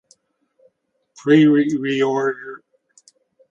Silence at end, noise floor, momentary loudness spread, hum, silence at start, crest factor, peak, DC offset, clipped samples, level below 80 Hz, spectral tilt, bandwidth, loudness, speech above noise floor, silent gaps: 0.95 s; -65 dBFS; 17 LU; none; 1.25 s; 20 dB; -2 dBFS; under 0.1%; under 0.1%; -70 dBFS; -6.5 dB/octave; 7.8 kHz; -17 LUFS; 48 dB; none